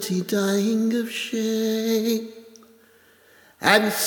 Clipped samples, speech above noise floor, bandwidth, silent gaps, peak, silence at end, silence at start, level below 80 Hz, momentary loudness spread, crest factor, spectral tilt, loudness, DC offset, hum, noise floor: under 0.1%; 33 dB; over 20 kHz; none; 0 dBFS; 0 s; 0 s; -72 dBFS; 8 LU; 24 dB; -4 dB/octave; -22 LUFS; under 0.1%; none; -55 dBFS